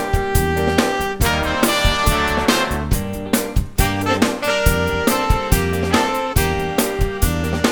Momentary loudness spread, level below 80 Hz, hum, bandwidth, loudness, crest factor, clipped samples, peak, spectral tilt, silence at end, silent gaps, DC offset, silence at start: 4 LU; -24 dBFS; none; over 20 kHz; -18 LUFS; 16 dB; under 0.1%; 0 dBFS; -4.5 dB/octave; 0 s; none; under 0.1%; 0 s